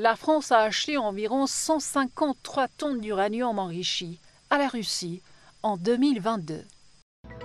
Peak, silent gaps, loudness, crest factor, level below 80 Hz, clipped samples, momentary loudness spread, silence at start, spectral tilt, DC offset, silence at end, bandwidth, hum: -6 dBFS; 7.02-7.24 s; -26 LUFS; 20 dB; -62 dBFS; under 0.1%; 10 LU; 0 s; -3.5 dB/octave; under 0.1%; 0 s; 13 kHz; none